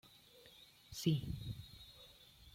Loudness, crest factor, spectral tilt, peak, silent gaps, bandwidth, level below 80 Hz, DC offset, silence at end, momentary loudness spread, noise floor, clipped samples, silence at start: -42 LUFS; 22 dB; -6 dB/octave; -22 dBFS; none; 16.5 kHz; -62 dBFS; under 0.1%; 0 s; 23 LU; -63 dBFS; under 0.1%; 0.05 s